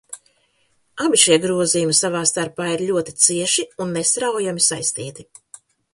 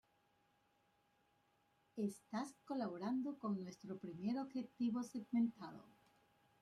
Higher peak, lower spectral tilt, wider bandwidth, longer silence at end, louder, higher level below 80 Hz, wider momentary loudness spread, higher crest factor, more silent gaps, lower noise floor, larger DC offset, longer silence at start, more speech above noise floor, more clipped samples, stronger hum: first, 0 dBFS vs -30 dBFS; second, -2.5 dB/octave vs -6.5 dB/octave; about the same, 11.5 kHz vs 12.5 kHz; about the same, 0.7 s vs 0.7 s; first, -17 LUFS vs -44 LUFS; first, -62 dBFS vs -86 dBFS; about the same, 13 LU vs 11 LU; about the same, 20 dB vs 16 dB; neither; second, -63 dBFS vs -79 dBFS; neither; second, 0.1 s vs 1.95 s; first, 44 dB vs 35 dB; neither; neither